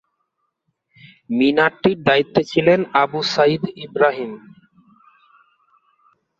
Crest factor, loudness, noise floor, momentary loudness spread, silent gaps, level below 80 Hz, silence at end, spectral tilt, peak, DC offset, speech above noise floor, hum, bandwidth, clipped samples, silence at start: 18 dB; -18 LUFS; -73 dBFS; 11 LU; none; -60 dBFS; 2 s; -6 dB/octave; -2 dBFS; under 0.1%; 56 dB; none; 7.6 kHz; under 0.1%; 1.3 s